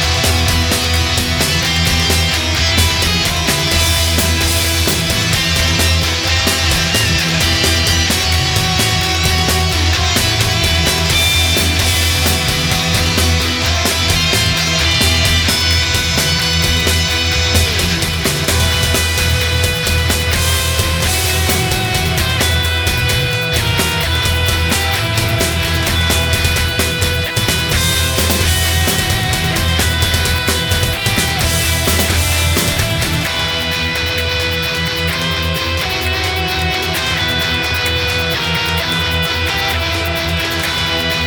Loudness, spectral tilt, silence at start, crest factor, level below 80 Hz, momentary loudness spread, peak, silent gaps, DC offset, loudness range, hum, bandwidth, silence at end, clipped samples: -13 LUFS; -3 dB/octave; 0 s; 14 dB; -24 dBFS; 4 LU; 0 dBFS; none; under 0.1%; 3 LU; none; over 20 kHz; 0 s; under 0.1%